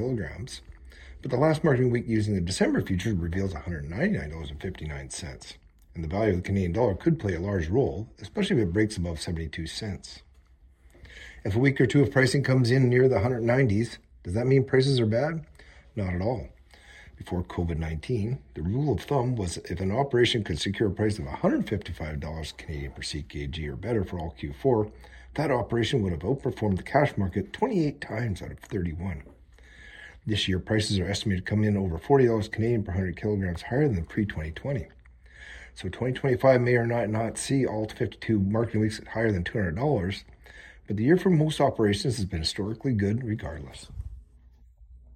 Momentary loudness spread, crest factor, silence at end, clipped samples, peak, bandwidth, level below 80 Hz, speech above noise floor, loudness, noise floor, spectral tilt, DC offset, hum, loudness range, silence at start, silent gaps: 15 LU; 20 dB; 0 s; under 0.1%; -6 dBFS; 13 kHz; -46 dBFS; 30 dB; -27 LUFS; -57 dBFS; -6.5 dB/octave; under 0.1%; none; 7 LU; 0 s; none